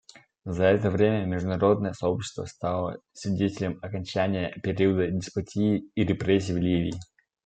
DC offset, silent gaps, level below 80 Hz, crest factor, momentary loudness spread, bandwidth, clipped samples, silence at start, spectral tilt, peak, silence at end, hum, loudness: under 0.1%; none; -56 dBFS; 18 dB; 10 LU; 9.2 kHz; under 0.1%; 0.45 s; -7 dB/octave; -8 dBFS; 0.4 s; none; -27 LUFS